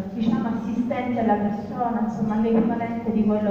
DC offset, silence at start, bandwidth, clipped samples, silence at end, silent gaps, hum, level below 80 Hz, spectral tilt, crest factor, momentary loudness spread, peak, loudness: under 0.1%; 0 s; 7 kHz; under 0.1%; 0 s; none; none; -52 dBFS; -9 dB/octave; 14 dB; 5 LU; -8 dBFS; -24 LUFS